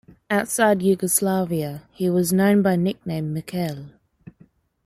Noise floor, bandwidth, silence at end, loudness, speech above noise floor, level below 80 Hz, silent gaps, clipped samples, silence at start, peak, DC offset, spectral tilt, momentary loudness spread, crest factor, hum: -56 dBFS; 15.5 kHz; 0.55 s; -21 LUFS; 35 dB; -58 dBFS; none; under 0.1%; 0.3 s; -4 dBFS; under 0.1%; -5.5 dB/octave; 10 LU; 18 dB; none